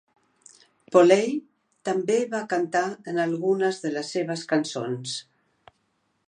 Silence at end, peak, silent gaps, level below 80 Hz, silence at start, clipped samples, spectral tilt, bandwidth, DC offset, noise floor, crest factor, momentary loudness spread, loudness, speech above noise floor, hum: 1.1 s; -4 dBFS; none; -78 dBFS; 0.9 s; under 0.1%; -5 dB/octave; 10 kHz; under 0.1%; -72 dBFS; 22 dB; 12 LU; -25 LUFS; 48 dB; none